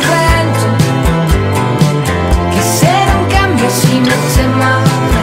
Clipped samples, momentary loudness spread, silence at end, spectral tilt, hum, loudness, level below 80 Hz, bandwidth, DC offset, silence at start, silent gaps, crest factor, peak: under 0.1%; 3 LU; 0 s; -5 dB/octave; none; -11 LUFS; -20 dBFS; 16.5 kHz; under 0.1%; 0 s; none; 10 dB; 0 dBFS